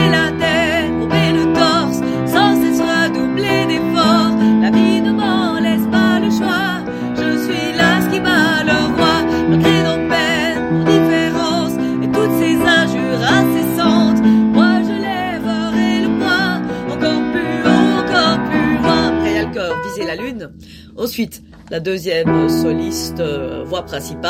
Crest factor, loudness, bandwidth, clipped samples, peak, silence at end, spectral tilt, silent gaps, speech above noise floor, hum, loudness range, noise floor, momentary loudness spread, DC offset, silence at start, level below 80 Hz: 14 dB; -15 LUFS; 16.5 kHz; under 0.1%; 0 dBFS; 0 s; -5.5 dB/octave; none; 19 dB; none; 5 LU; -37 dBFS; 9 LU; under 0.1%; 0 s; -42 dBFS